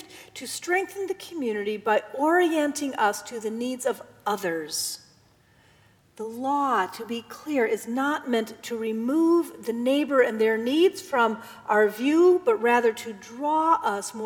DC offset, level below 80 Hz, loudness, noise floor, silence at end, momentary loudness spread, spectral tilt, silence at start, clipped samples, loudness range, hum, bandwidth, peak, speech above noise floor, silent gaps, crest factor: under 0.1%; -74 dBFS; -25 LUFS; -59 dBFS; 0 s; 12 LU; -3.5 dB/octave; 0 s; under 0.1%; 7 LU; none; 19 kHz; -8 dBFS; 35 dB; none; 18 dB